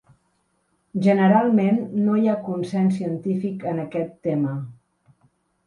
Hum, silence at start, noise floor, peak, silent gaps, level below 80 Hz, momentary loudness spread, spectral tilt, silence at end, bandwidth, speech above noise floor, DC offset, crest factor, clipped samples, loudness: none; 0.95 s; -68 dBFS; -6 dBFS; none; -66 dBFS; 11 LU; -9 dB/octave; 0.95 s; 10 kHz; 48 dB; under 0.1%; 16 dB; under 0.1%; -22 LUFS